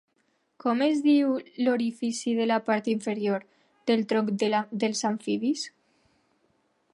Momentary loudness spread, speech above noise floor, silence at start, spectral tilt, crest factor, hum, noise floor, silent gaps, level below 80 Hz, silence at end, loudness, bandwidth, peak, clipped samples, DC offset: 7 LU; 46 dB; 0.65 s; -4.5 dB/octave; 16 dB; none; -72 dBFS; none; -80 dBFS; 1.25 s; -27 LUFS; 11.5 kHz; -10 dBFS; under 0.1%; under 0.1%